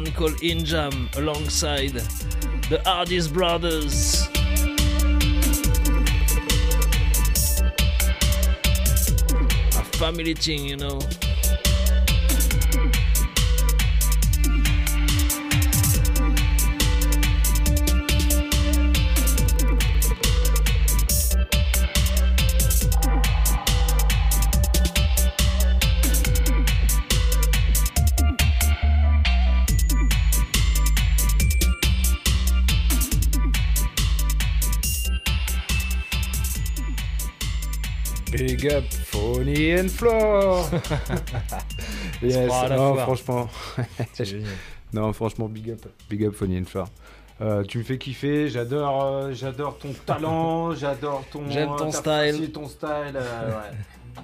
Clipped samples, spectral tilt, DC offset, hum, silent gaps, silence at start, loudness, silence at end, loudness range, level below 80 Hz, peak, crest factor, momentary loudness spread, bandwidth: under 0.1%; -4 dB/octave; under 0.1%; none; none; 0 s; -22 LUFS; 0 s; 6 LU; -22 dBFS; -6 dBFS; 14 dB; 9 LU; 16.5 kHz